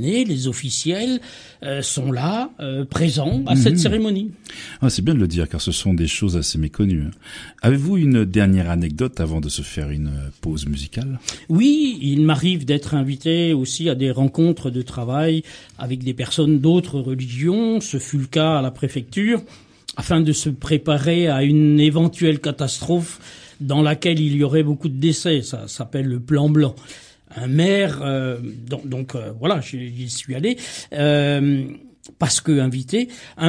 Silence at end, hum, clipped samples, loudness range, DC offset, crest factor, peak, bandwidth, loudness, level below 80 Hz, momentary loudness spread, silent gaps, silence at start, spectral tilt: 0 s; none; under 0.1%; 4 LU; under 0.1%; 18 dB; 0 dBFS; 10.5 kHz; -20 LUFS; -40 dBFS; 12 LU; none; 0 s; -5.5 dB/octave